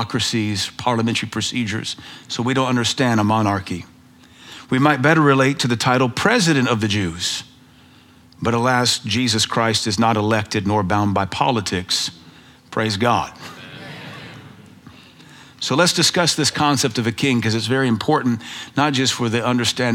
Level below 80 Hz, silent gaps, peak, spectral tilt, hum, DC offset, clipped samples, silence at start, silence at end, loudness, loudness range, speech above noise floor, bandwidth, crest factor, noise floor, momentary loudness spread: -56 dBFS; none; 0 dBFS; -4 dB/octave; none; under 0.1%; under 0.1%; 0 s; 0 s; -18 LUFS; 5 LU; 30 dB; 16.5 kHz; 20 dB; -48 dBFS; 13 LU